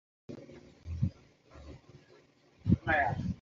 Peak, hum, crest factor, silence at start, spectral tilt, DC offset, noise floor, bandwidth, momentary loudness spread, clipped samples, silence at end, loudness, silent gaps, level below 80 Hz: -14 dBFS; none; 22 dB; 0.3 s; -6.5 dB/octave; under 0.1%; -63 dBFS; 7.2 kHz; 25 LU; under 0.1%; 0.05 s; -32 LUFS; none; -48 dBFS